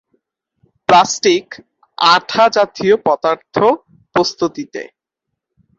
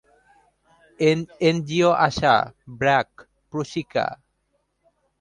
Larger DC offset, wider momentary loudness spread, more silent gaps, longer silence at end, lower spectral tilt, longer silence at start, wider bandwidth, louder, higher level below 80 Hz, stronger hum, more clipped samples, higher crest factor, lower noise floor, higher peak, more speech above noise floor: neither; first, 15 LU vs 12 LU; neither; about the same, 0.95 s vs 1.05 s; second, -3.5 dB/octave vs -5.5 dB/octave; about the same, 0.9 s vs 1 s; second, 8 kHz vs 10.5 kHz; first, -14 LUFS vs -22 LUFS; about the same, -58 dBFS vs -54 dBFS; neither; neither; about the same, 16 dB vs 20 dB; first, -78 dBFS vs -71 dBFS; about the same, 0 dBFS vs -2 dBFS; first, 64 dB vs 50 dB